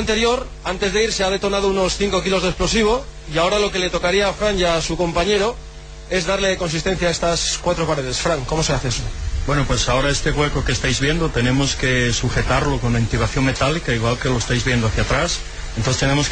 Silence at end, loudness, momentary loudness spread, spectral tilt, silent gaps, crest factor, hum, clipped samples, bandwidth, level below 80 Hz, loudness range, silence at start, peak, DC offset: 0 s; -19 LUFS; 5 LU; -4 dB/octave; none; 16 dB; none; under 0.1%; 9.6 kHz; -28 dBFS; 1 LU; 0 s; -4 dBFS; under 0.1%